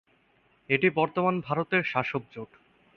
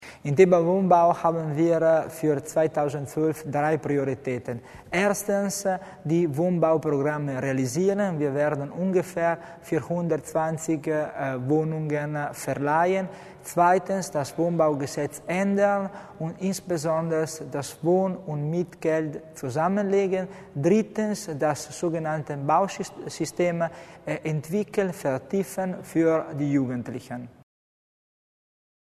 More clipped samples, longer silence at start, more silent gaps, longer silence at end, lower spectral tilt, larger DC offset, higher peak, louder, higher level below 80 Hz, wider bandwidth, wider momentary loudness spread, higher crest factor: neither; first, 0.7 s vs 0 s; neither; second, 0.5 s vs 1.65 s; first, -8 dB/octave vs -6.5 dB/octave; neither; second, -8 dBFS vs -4 dBFS; about the same, -27 LUFS vs -25 LUFS; about the same, -66 dBFS vs -64 dBFS; second, 6.4 kHz vs 13.5 kHz; first, 19 LU vs 10 LU; about the same, 22 dB vs 20 dB